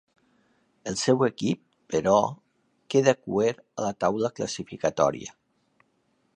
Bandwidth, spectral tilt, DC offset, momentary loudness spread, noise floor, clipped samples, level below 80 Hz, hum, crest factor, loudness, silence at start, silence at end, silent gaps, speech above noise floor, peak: 10.5 kHz; -5 dB/octave; under 0.1%; 11 LU; -70 dBFS; under 0.1%; -62 dBFS; none; 20 dB; -26 LUFS; 0.85 s; 1.05 s; none; 45 dB; -6 dBFS